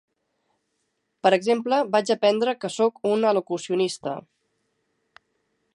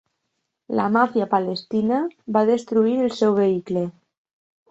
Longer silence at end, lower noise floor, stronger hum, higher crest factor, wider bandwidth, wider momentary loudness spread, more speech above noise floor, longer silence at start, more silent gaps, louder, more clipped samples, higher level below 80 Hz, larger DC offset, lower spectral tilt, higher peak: first, 1.55 s vs 0.8 s; about the same, -75 dBFS vs -77 dBFS; neither; about the same, 18 dB vs 18 dB; first, 11.5 kHz vs 8 kHz; about the same, 6 LU vs 7 LU; second, 53 dB vs 57 dB; first, 1.25 s vs 0.7 s; neither; about the same, -23 LUFS vs -21 LUFS; neither; second, -78 dBFS vs -66 dBFS; neither; second, -4.5 dB/octave vs -7 dB/octave; about the same, -6 dBFS vs -4 dBFS